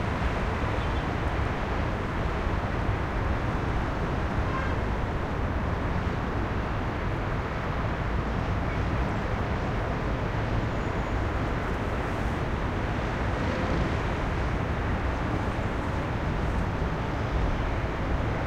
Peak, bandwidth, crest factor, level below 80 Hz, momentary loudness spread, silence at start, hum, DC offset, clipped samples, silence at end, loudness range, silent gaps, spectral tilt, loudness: -14 dBFS; 9.8 kHz; 14 dB; -32 dBFS; 1 LU; 0 s; none; under 0.1%; under 0.1%; 0 s; 1 LU; none; -7 dB/octave; -29 LUFS